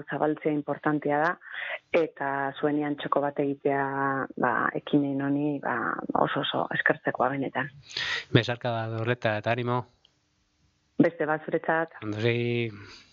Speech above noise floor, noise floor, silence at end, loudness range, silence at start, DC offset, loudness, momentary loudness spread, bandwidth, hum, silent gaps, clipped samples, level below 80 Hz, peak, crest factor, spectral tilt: 43 dB; -71 dBFS; 0.15 s; 2 LU; 0 s; under 0.1%; -28 LUFS; 6 LU; 7.4 kHz; none; none; under 0.1%; -68 dBFS; -6 dBFS; 22 dB; -7 dB/octave